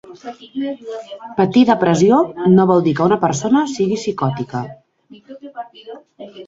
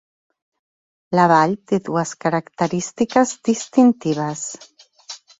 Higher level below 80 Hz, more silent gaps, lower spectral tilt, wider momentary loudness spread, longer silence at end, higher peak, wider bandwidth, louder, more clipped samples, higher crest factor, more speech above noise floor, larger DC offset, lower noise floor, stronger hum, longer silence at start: first, -56 dBFS vs -62 dBFS; neither; about the same, -6.5 dB/octave vs -5.5 dB/octave; first, 21 LU vs 14 LU; second, 0.05 s vs 0.25 s; about the same, -2 dBFS vs -2 dBFS; about the same, 7.8 kHz vs 8 kHz; first, -16 LUFS vs -19 LUFS; neither; about the same, 16 dB vs 18 dB; about the same, 25 dB vs 22 dB; neither; about the same, -41 dBFS vs -40 dBFS; neither; second, 0.1 s vs 1.1 s